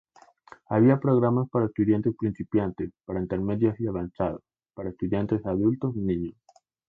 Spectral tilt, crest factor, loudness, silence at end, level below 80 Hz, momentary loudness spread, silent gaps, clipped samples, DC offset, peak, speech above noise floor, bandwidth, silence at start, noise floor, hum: -11.5 dB/octave; 18 dB; -26 LUFS; 0.6 s; -52 dBFS; 11 LU; none; under 0.1%; under 0.1%; -8 dBFS; 28 dB; 4.4 kHz; 0.7 s; -53 dBFS; none